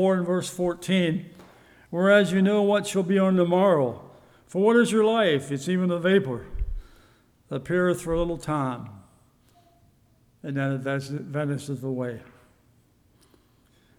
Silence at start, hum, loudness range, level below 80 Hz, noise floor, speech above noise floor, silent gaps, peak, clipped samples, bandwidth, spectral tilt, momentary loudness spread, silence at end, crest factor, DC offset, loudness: 0 s; none; 10 LU; -44 dBFS; -61 dBFS; 38 dB; none; -6 dBFS; under 0.1%; 14.5 kHz; -6 dB/octave; 16 LU; 1.75 s; 18 dB; under 0.1%; -24 LUFS